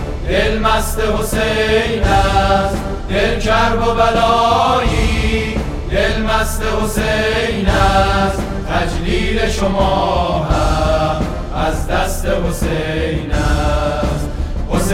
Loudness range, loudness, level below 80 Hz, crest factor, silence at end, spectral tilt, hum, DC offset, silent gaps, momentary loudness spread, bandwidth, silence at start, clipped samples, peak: 3 LU; -16 LUFS; -20 dBFS; 14 dB; 0 s; -5 dB/octave; none; under 0.1%; none; 7 LU; 16.5 kHz; 0 s; under 0.1%; 0 dBFS